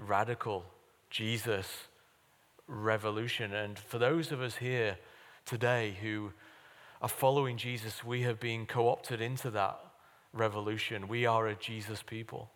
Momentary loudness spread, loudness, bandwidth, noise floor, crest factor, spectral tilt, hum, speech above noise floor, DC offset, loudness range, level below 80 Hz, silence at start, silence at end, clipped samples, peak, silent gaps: 11 LU; -35 LUFS; 19 kHz; -68 dBFS; 22 dB; -5 dB/octave; none; 33 dB; under 0.1%; 3 LU; -76 dBFS; 0 s; 0.05 s; under 0.1%; -14 dBFS; none